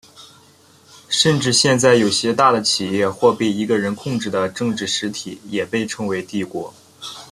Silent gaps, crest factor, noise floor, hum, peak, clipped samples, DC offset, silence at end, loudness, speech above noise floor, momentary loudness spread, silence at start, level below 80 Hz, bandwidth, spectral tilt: none; 18 dB; -50 dBFS; none; 0 dBFS; under 0.1%; under 0.1%; 0.05 s; -18 LUFS; 32 dB; 14 LU; 0.2 s; -58 dBFS; 14 kHz; -3.5 dB/octave